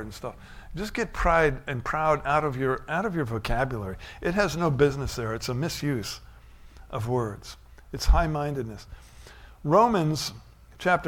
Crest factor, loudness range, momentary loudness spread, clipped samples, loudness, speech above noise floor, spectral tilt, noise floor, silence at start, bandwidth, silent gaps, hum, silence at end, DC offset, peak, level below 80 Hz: 20 dB; 5 LU; 15 LU; under 0.1%; -27 LUFS; 22 dB; -5.5 dB/octave; -48 dBFS; 0 s; 17 kHz; none; none; 0 s; under 0.1%; -8 dBFS; -36 dBFS